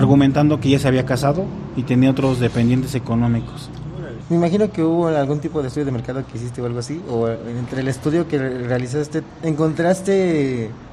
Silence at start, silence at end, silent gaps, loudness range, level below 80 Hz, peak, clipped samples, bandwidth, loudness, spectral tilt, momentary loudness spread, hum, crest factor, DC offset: 0 s; 0 s; none; 5 LU; -44 dBFS; -2 dBFS; under 0.1%; 14 kHz; -19 LUFS; -7.5 dB/octave; 10 LU; none; 16 dB; under 0.1%